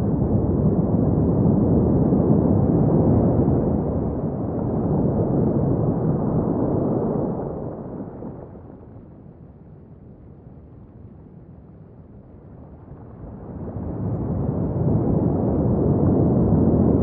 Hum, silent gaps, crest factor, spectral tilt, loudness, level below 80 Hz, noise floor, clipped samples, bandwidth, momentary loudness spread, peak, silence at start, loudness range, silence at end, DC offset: none; none; 16 dB; -16 dB/octave; -21 LUFS; -36 dBFS; -44 dBFS; under 0.1%; 2.3 kHz; 18 LU; -4 dBFS; 0 s; 20 LU; 0 s; under 0.1%